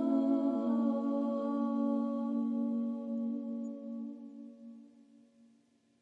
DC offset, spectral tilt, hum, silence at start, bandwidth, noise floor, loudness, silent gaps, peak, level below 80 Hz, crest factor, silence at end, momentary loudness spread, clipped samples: under 0.1%; -9 dB/octave; none; 0 s; 4.5 kHz; -69 dBFS; -34 LUFS; none; -20 dBFS; under -90 dBFS; 14 dB; 1.15 s; 18 LU; under 0.1%